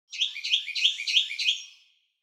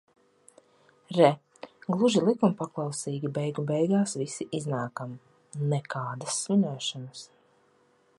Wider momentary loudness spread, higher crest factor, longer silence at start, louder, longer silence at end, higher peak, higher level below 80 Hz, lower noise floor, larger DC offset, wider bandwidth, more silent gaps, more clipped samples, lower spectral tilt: second, 6 LU vs 17 LU; about the same, 20 dB vs 22 dB; second, 0.1 s vs 1.1 s; first, -24 LUFS vs -28 LUFS; second, 0.5 s vs 0.95 s; about the same, -8 dBFS vs -6 dBFS; second, under -90 dBFS vs -76 dBFS; second, -61 dBFS vs -65 dBFS; neither; first, 16 kHz vs 11.5 kHz; neither; neither; second, 12.5 dB/octave vs -5.5 dB/octave